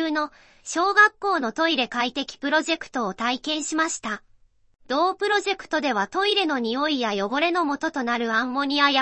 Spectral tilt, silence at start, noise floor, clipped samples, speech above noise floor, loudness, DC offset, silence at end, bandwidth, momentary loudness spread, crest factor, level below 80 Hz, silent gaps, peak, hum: -2 dB/octave; 0 s; -58 dBFS; under 0.1%; 34 dB; -23 LUFS; under 0.1%; 0 s; 8.8 kHz; 9 LU; 20 dB; -62 dBFS; none; -4 dBFS; none